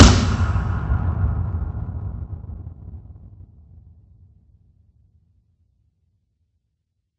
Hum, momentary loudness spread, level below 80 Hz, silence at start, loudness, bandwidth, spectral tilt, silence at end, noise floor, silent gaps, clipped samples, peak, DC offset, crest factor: none; 21 LU; -28 dBFS; 0 s; -22 LUFS; 8.6 kHz; -5.5 dB/octave; 3.75 s; -75 dBFS; none; under 0.1%; 0 dBFS; under 0.1%; 22 dB